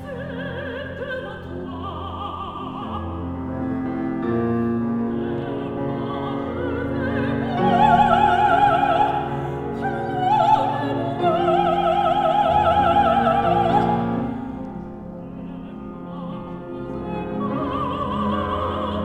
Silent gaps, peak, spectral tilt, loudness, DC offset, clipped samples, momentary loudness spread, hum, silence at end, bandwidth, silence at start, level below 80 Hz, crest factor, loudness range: none; -4 dBFS; -7.5 dB/octave; -22 LUFS; under 0.1%; under 0.1%; 15 LU; none; 0 s; 10 kHz; 0 s; -44 dBFS; 18 dB; 11 LU